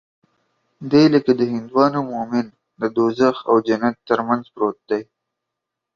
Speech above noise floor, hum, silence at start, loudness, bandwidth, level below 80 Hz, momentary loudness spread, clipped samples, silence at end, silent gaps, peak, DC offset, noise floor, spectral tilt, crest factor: 64 dB; none; 0.8 s; -19 LUFS; 7.2 kHz; -62 dBFS; 11 LU; under 0.1%; 0.9 s; none; -2 dBFS; under 0.1%; -82 dBFS; -7 dB/octave; 18 dB